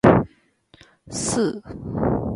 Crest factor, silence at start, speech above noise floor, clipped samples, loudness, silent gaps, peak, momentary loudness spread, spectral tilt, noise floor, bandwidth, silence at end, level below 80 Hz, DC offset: 20 dB; 0.05 s; 32 dB; under 0.1%; -24 LUFS; none; -2 dBFS; 14 LU; -6 dB/octave; -56 dBFS; 11.5 kHz; 0 s; -40 dBFS; under 0.1%